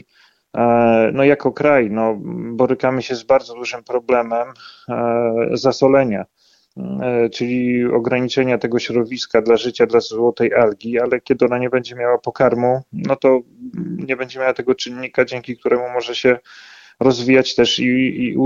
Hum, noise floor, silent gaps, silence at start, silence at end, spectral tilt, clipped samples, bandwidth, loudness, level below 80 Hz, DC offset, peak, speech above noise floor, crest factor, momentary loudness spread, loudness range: none; -56 dBFS; none; 0.55 s; 0 s; -5.5 dB/octave; under 0.1%; 7.6 kHz; -17 LUFS; -56 dBFS; under 0.1%; -2 dBFS; 39 dB; 16 dB; 9 LU; 3 LU